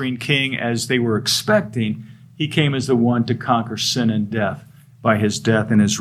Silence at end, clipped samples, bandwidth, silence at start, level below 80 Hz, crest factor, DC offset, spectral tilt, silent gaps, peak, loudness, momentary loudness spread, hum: 0 s; under 0.1%; 15 kHz; 0 s; -58 dBFS; 18 dB; under 0.1%; -5 dB/octave; none; -2 dBFS; -19 LUFS; 7 LU; none